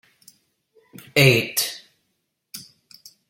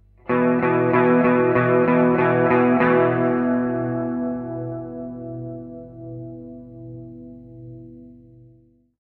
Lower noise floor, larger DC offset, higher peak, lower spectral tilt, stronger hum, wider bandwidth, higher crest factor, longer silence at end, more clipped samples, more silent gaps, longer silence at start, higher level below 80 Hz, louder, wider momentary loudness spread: first, -74 dBFS vs -55 dBFS; neither; first, 0 dBFS vs -4 dBFS; second, -4 dB/octave vs -11 dB/octave; neither; first, 17 kHz vs 4.2 kHz; first, 24 dB vs 16 dB; second, 0.7 s vs 1 s; neither; neither; first, 1.15 s vs 0.25 s; about the same, -58 dBFS vs -54 dBFS; about the same, -18 LUFS vs -19 LUFS; about the same, 24 LU vs 22 LU